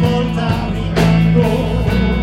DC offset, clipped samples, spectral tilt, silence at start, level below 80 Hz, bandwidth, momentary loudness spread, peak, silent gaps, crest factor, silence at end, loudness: under 0.1%; under 0.1%; -7.5 dB/octave; 0 s; -24 dBFS; 13 kHz; 6 LU; 0 dBFS; none; 12 dB; 0 s; -15 LUFS